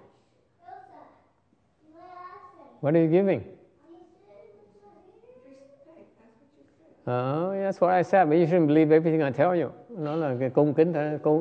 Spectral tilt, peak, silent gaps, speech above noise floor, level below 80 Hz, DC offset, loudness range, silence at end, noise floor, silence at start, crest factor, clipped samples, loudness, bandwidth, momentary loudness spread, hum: -9.5 dB/octave; -8 dBFS; none; 45 dB; -74 dBFS; under 0.1%; 11 LU; 0 s; -67 dBFS; 0.7 s; 18 dB; under 0.1%; -24 LUFS; 7 kHz; 14 LU; none